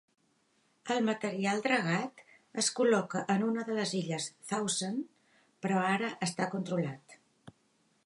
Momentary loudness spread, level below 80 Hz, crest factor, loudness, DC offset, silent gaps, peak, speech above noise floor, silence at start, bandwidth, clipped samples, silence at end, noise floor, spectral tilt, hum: 11 LU; -82 dBFS; 18 dB; -32 LUFS; under 0.1%; none; -16 dBFS; 40 dB; 0.85 s; 11.5 kHz; under 0.1%; 0.55 s; -72 dBFS; -4 dB/octave; none